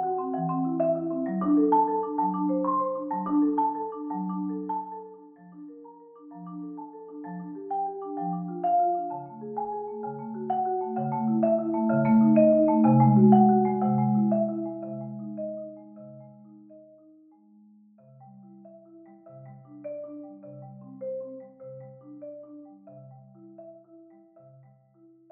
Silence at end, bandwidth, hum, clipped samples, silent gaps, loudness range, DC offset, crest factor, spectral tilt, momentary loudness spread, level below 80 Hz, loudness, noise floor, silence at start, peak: 1.35 s; 3.1 kHz; none; under 0.1%; none; 22 LU; under 0.1%; 20 dB; -11.5 dB/octave; 26 LU; -72 dBFS; -25 LUFS; -58 dBFS; 0 s; -6 dBFS